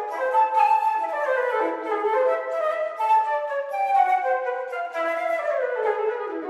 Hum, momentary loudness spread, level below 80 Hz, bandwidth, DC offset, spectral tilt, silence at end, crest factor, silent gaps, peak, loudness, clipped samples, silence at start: none; 7 LU; -86 dBFS; 12.5 kHz; under 0.1%; -2 dB/octave; 0 s; 14 dB; none; -8 dBFS; -23 LUFS; under 0.1%; 0 s